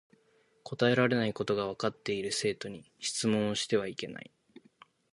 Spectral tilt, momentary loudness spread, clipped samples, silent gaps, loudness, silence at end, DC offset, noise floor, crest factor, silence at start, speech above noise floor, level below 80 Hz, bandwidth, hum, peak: -4.5 dB/octave; 16 LU; under 0.1%; none; -31 LUFS; 0.95 s; under 0.1%; -68 dBFS; 20 dB; 0.65 s; 37 dB; -68 dBFS; 11.5 kHz; none; -12 dBFS